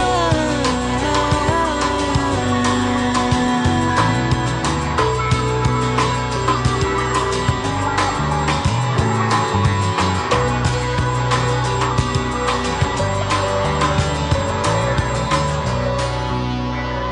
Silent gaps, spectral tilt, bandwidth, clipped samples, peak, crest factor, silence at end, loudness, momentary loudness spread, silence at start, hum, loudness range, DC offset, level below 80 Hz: none; -5 dB/octave; 11 kHz; under 0.1%; -2 dBFS; 16 dB; 0 s; -18 LUFS; 3 LU; 0 s; none; 1 LU; under 0.1%; -30 dBFS